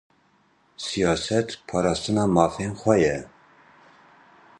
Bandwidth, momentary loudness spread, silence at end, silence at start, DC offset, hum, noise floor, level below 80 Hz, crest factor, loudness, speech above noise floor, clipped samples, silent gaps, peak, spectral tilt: 11 kHz; 9 LU; 1.35 s; 0.8 s; under 0.1%; none; -62 dBFS; -50 dBFS; 22 dB; -23 LUFS; 40 dB; under 0.1%; none; -4 dBFS; -5.5 dB/octave